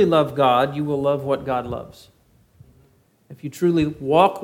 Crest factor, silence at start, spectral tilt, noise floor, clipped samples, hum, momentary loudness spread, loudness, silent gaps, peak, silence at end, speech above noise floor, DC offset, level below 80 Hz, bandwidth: 20 dB; 0 s; -7 dB/octave; -58 dBFS; under 0.1%; none; 16 LU; -20 LUFS; none; -2 dBFS; 0 s; 38 dB; under 0.1%; -52 dBFS; 17 kHz